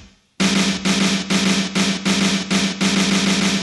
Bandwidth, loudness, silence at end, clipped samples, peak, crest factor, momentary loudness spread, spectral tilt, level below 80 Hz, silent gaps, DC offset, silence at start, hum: 12 kHz; -17 LUFS; 0 s; under 0.1%; -6 dBFS; 14 dB; 2 LU; -3.5 dB/octave; -48 dBFS; none; under 0.1%; 0 s; none